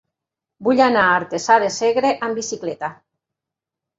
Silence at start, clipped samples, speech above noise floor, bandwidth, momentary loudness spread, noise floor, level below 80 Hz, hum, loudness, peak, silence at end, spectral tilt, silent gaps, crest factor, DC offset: 0.6 s; under 0.1%; 68 dB; 8 kHz; 12 LU; -85 dBFS; -64 dBFS; none; -18 LUFS; -2 dBFS; 1.05 s; -3.5 dB/octave; none; 18 dB; under 0.1%